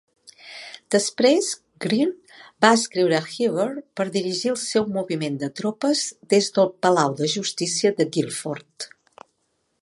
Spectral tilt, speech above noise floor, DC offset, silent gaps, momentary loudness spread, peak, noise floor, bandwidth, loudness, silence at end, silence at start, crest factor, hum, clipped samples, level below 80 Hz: -4 dB/octave; 50 dB; under 0.1%; none; 14 LU; 0 dBFS; -71 dBFS; 11.5 kHz; -22 LUFS; 0.95 s; 0.45 s; 22 dB; none; under 0.1%; -72 dBFS